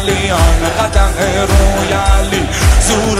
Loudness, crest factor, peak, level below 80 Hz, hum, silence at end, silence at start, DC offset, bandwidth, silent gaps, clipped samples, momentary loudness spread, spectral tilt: -12 LUFS; 10 dB; 0 dBFS; -14 dBFS; none; 0 s; 0 s; under 0.1%; 15.5 kHz; none; under 0.1%; 2 LU; -4.5 dB/octave